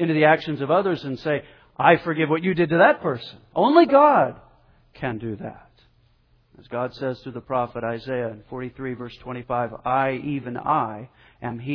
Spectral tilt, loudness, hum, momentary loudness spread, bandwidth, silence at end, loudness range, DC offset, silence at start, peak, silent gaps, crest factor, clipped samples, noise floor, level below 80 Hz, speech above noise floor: -9 dB/octave; -22 LUFS; none; 17 LU; 5.4 kHz; 0 s; 12 LU; under 0.1%; 0 s; -2 dBFS; none; 22 dB; under 0.1%; -60 dBFS; -56 dBFS; 38 dB